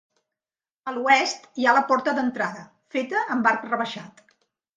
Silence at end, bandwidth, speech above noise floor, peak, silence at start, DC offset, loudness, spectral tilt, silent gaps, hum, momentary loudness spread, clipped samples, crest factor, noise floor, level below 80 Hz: 0.7 s; 9.4 kHz; over 67 dB; -4 dBFS; 0.85 s; under 0.1%; -23 LUFS; -3 dB/octave; none; none; 13 LU; under 0.1%; 20 dB; under -90 dBFS; -76 dBFS